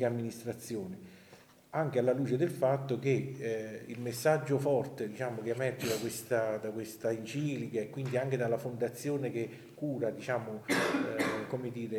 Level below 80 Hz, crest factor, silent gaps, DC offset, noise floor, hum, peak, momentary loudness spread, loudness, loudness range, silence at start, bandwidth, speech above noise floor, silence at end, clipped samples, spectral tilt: -76 dBFS; 18 dB; none; under 0.1%; -58 dBFS; none; -16 dBFS; 9 LU; -34 LUFS; 3 LU; 0 s; 20 kHz; 25 dB; 0 s; under 0.1%; -6 dB/octave